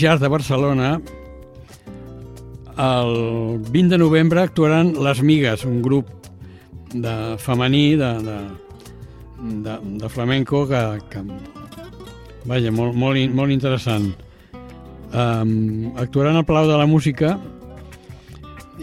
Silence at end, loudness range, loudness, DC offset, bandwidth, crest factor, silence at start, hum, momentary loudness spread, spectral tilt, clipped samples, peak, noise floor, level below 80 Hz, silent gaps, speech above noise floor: 0 s; 7 LU; -19 LUFS; under 0.1%; 14 kHz; 16 dB; 0 s; none; 24 LU; -7 dB/octave; under 0.1%; -2 dBFS; -41 dBFS; -44 dBFS; none; 23 dB